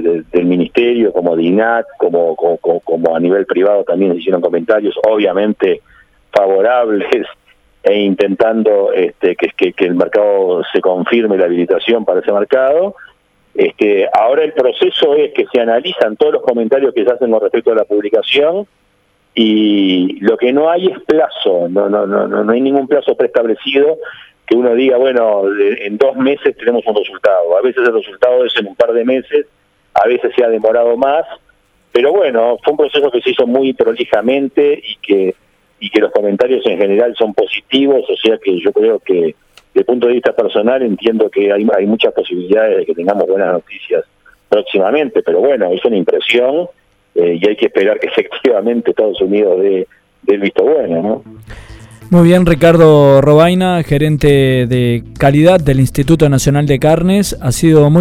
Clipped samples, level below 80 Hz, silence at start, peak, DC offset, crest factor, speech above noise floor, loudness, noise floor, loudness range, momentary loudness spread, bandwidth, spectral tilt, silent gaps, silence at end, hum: 0.1%; -38 dBFS; 0 s; 0 dBFS; under 0.1%; 12 dB; 44 dB; -12 LUFS; -56 dBFS; 4 LU; 5 LU; 15 kHz; -6.5 dB/octave; none; 0 s; none